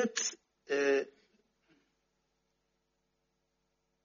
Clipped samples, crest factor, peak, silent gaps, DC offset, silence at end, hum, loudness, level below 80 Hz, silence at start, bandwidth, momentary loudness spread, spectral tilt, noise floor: under 0.1%; 22 dB; -18 dBFS; none; under 0.1%; 2.95 s; none; -33 LUFS; -86 dBFS; 0 s; 7.2 kHz; 8 LU; -1.5 dB/octave; -81 dBFS